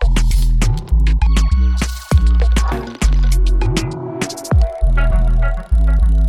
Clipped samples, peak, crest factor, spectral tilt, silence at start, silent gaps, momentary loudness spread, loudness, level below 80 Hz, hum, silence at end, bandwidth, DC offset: under 0.1%; -2 dBFS; 10 dB; -6 dB/octave; 0 s; none; 6 LU; -17 LUFS; -14 dBFS; none; 0 s; 13 kHz; under 0.1%